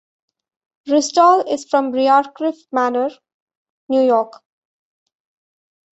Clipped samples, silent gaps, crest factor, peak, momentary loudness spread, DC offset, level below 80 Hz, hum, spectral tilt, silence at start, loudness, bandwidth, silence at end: under 0.1%; 3.34-3.47 s, 3.57-3.89 s; 18 dB; -2 dBFS; 11 LU; under 0.1%; -70 dBFS; none; -2.5 dB/octave; 0.85 s; -17 LUFS; 8.2 kHz; 1.65 s